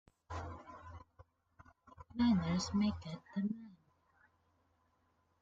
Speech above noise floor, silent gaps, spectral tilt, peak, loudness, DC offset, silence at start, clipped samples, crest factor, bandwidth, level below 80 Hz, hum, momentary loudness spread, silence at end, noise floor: 42 dB; none; -6 dB/octave; -24 dBFS; -38 LUFS; under 0.1%; 0.3 s; under 0.1%; 18 dB; 7.8 kHz; -64 dBFS; none; 22 LU; 1.7 s; -77 dBFS